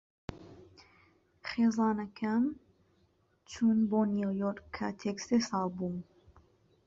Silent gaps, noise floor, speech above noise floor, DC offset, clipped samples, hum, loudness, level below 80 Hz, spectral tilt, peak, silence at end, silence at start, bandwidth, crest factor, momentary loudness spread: none; -71 dBFS; 40 dB; under 0.1%; under 0.1%; none; -32 LUFS; -64 dBFS; -6 dB/octave; -18 dBFS; 0.85 s; 0.3 s; 7.6 kHz; 16 dB; 19 LU